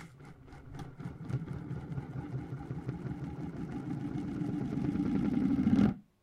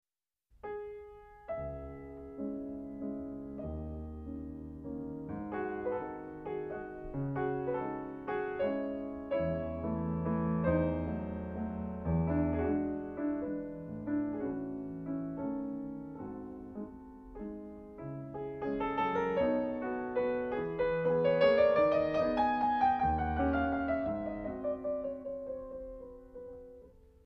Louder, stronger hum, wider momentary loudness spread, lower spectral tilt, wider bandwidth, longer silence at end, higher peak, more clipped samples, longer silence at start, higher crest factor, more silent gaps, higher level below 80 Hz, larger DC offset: about the same, -35 LUFS vs -35 LUFS; neither; first, 18 LU vs 15 LU; about the same, -9 dB/octave vs -9.5 dB/octave; first, 10 kHz vs 6.2 kHz; second, 0.2 s vs 0.35 s; about the same, -16 dBFS vs -14 dBFS; neither; second, 0 s vs 0.65 s; about the same, 20 dB vs 20 dB; neither; about the same, -54 dBFS vs -52 dBFS; neither